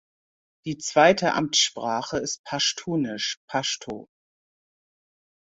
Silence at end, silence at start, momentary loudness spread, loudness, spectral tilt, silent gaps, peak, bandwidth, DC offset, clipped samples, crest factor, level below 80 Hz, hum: 1.45 s; 0.65 s; 15 LU; -24 LUFS; -2.5 dB/octave; 2.39-2.44 s, 3.37-3.48 s; -4 dBFS; 8 kHz; under 0.1%; under 0.1%; 22 dB; -62 dBFS; none